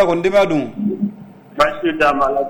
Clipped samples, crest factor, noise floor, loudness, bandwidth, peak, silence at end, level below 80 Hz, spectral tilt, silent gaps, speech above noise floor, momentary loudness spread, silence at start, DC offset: under 0.1%; 12 dB; -36 dBFS; -17 LUFS; 19 kHz; -4 dBFS; 0 s; -44 dBFS; -6 dB/octave; none; 21 dB; 9 LU; 0 s; under 0.1%